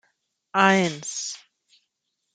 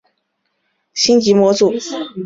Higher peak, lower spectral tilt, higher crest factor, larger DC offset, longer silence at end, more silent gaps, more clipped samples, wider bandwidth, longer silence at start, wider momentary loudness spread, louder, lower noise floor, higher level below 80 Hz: about the same, -2 dBFS vs -2 dBFS; about the same, -3.5 dB/octave vs -4 dB/octave; first, 24 dB vs 14 dB; neither; first, 0.95 s vs 0 s; neither; neither; first, 9.4 kHz vs 7.8 kHz; second, 0.55 s vs 0.95 s; about the same, 15 LU vs 13 LU; second, -22 LUFS vs -14 LUFS; first, -78 dBFS vs -69 dBFS; second, -70 dBFS vs -58 dBFS